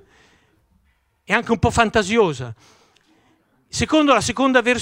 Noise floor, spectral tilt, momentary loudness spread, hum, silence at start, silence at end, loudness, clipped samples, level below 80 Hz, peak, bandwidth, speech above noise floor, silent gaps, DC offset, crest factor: -64 dBFS; -4.5 dB/octave; 12 LU; none; 1.3 s; 0 s; -18 LUFS; under 0.1%; -42 dBFS; 0 dBFS; 16 kHz; 46 dB; none; under 0.1%; 20 dB